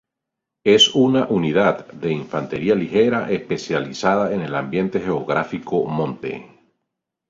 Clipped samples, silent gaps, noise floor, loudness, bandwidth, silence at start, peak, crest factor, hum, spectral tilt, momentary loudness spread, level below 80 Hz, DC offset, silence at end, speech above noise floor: under 0.1%; none; -83 dBFS; -19 LUFS; 7.8 kHz; 0.65 s; -2 dBFS; 18 dB; none; -5 dB/octave; 12 LU; -56 dBFS; under 0.1%; 0.85 s; 63 dB